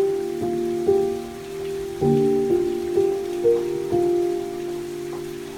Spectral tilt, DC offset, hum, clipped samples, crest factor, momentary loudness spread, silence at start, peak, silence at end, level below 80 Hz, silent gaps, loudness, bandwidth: -7 dB/octave; under 0.1%; none; under 0.1%; 14 dB; 11 LU; 0 s; -8 dBFS; 0 s; -52 dBFS; none; -23 LUFS; 17.5 kHz